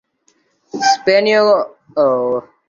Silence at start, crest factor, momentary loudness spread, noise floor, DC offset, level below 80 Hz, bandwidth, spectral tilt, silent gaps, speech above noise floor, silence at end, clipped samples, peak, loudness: 0.75 s; 14 dB; 9 LU; -60 dBFS; under 0.1%; -62 dBFS; 7.6 kHz; -3 dB/octave; none; 46 dB; 0.25 s; under 0.1%; -2 dBFS; -14 LUFS